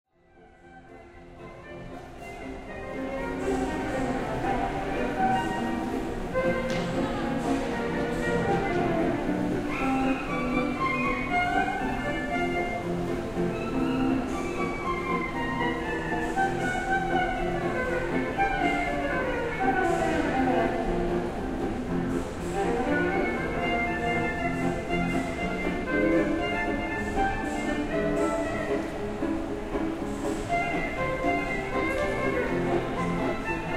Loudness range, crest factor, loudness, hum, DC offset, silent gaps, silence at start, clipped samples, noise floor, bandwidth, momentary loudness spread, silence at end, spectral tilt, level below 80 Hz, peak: 3 LU; 16 dB; -28 LUFS; none; under 0.1%; none; 0.35 s; under 0.1%; -56 dBFS; 15.5 kHz; 6 LU; 0 s; -6 dB/octave; -40 dBFS; -12 dBFS